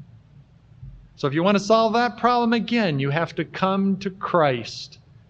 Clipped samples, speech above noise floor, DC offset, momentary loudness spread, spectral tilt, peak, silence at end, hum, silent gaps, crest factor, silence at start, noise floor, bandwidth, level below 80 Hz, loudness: under 0.1%; 30 dB; under 0.1%; 11 LU; -6 dB/octave; -4 dBFS; 0.4 s; none; none; 18 dB; 0 s; -51 dBFS; 8.2 kHz; -56 dBFS; -21 LUFS